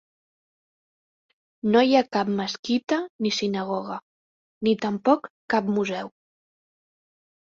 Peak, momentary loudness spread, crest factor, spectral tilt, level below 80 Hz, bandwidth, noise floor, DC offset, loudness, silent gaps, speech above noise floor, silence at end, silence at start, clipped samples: -6 dBFS; 10 LU; 20 dB; -5 dB/octave; -68 dBFS; 7.6 kHz; under -90 dBFS; under 0.1%; -24 LUFS; 2.59-2.63 s, 3.10-3.19 s, 4.03-4.61 s, 5.30-5.48 s; over 67 dB; 1.5 s; 1.65 s; under 0.1%